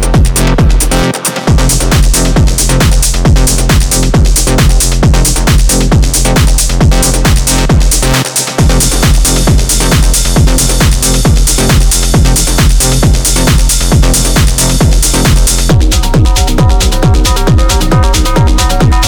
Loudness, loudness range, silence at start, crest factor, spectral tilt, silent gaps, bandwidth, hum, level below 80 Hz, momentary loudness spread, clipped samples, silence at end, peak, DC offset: -8 LUFS; 1 LU; 0 s; 6 dB; -4 dB/octave; none; over 20 kHz; none; -8 dBFS; 1 LU; under 0.1%; 0 s; 0 dBFS; under 0.1%